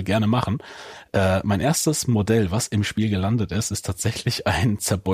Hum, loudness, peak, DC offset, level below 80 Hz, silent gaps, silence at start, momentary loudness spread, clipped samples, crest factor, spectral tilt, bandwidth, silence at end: none; -22 LUFS; -8 dBFS; under 0.1%; -44 dBFS; none; 0 s; 6 LU; under 0.1%; 14 dB; -5 dB/octave; 15.5 kHz; 0 s